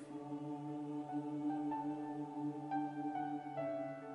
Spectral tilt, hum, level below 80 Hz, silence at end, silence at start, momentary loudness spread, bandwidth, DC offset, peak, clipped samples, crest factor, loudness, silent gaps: -8 dB/octave; none; -88 dBFS; 0 s; 0 s; 5 LU; 10.5 kHz; under 0.1%; -30 dBFS; under 0.1%; 12 dB; -43 LUFS; none